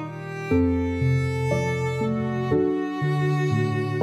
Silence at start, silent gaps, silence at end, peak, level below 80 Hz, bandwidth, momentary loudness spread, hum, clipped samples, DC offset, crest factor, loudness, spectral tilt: 0 s; none; 0 s; -10 dBFS; -44 dBFS; 12 kHz; 3 LU; none; under 0.1%; under 0.1%; 14 dB; -24 LUFS; -8 dB/octave